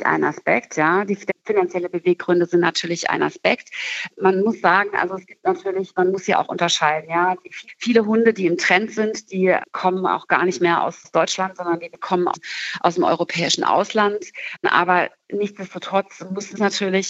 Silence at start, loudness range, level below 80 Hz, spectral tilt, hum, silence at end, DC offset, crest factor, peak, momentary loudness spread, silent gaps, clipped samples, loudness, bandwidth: 0 s; 2 LU; -72 dBFS; -4 dB/octave; none; 0 s; under 0.1%; 18 dB; -2 dBFS; 9 LU; none; under 0.1%; -20 LUFS; 8.2 kHz